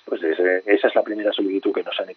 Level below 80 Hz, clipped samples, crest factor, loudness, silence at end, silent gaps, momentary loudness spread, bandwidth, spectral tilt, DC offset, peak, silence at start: -82 dBFS; under 0.1%; 18 dB; -21 LUFS; 0.05 s; none; 6 LU; 4.9 kHz; -0.5 dB/octave; under 0.1%; -4 dBFS; 0.05 s